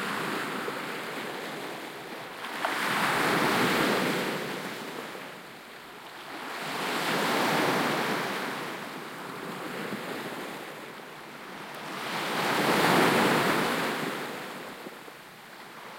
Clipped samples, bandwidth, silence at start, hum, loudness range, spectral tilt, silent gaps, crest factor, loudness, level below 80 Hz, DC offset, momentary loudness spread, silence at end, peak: under 0.1%; 16.5 kHz; 0 s; none; 9 LU; -3.5 dB/octave; none; 22 dB; -29 LUFS; -70 dBFS; under 0.1%; 18 LU; 0 s; -10 dBFS